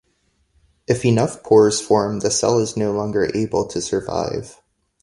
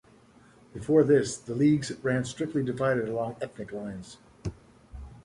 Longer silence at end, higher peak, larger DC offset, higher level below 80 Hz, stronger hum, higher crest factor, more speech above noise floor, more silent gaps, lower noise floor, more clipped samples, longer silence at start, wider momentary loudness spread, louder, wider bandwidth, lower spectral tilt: first, 0.5 s vs 0.05 s; first, -2 dBFS vs -10 dBFS; neither; about the same, -50 dBFS vs -54 dBFS; neither; about the same, 18 dB vs 18 dB; first, 47 dB vs 30 dB; neither; first, -65 dBFS vs -57 dBFS; neither; first, 0.9 s vs 0.75 s; second, 9 LU vs 19 LU; first, -19 LUFS vs -27 LUFS; about the same, 11.5 kHz vs 11.5 kHz; second, -5 dB/octave vs -6.5 dB/octave